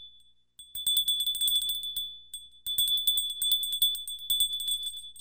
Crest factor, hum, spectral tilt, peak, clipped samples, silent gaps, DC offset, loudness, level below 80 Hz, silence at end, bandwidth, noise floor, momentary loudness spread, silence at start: 18 dB; 60 Hz at -65 dBFS; 3 dB/octave; -12 dBFS; under 0.1%; none; 0.1%; -26 LUFS; -62 dBFS; 0 s; 16.5 kHz; -61 dBFS; 13 LU; 0 s